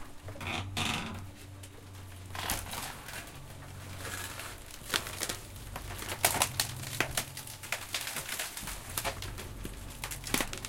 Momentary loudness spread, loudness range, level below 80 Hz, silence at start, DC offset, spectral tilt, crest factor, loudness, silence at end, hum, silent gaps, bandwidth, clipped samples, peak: 17 LU; 7 LU; -50 dBFS; 0 s; under 0.1%; -2 dB/octave; 30 dB; -35 LUFS; 0 s; none; none; 17 kHz; under 0.1%; -8 dBFS